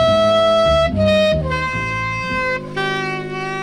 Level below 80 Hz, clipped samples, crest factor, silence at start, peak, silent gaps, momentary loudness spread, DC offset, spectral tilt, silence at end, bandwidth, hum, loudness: -34 dBFS; under 0.1%; 14 dB; 0 s; -4 dBFS; none; 8 LU; under 0.1%; -5.5 dB/octave; 0 s; 11.5 kHz; none; -17 LUFS